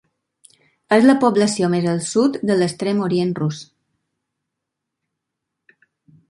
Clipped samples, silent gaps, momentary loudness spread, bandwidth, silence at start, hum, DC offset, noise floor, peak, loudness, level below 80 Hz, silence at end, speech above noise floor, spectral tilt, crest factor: under 0.1%; none; 8 LU; 11.5 kHz; 0.9 s; none; under 0.1%; -81 dBFS; -2 dBFS; -18 LUFS; -64 dBFS; 2.65 s; 64 dB; -5.5 dB/octave; 18 dB